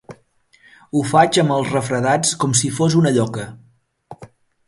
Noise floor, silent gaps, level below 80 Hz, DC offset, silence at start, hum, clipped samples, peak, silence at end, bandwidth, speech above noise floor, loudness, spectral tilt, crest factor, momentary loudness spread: -56 dBFS; none; -56 dBFS; under 0.1%; 0.1 s; none; under 0.1%; 0 dBFS; 0.4 s; 11.5 kHz; 39 dB; -17 LUFS; -4.5 dB/octave; 20 dB; 9 LU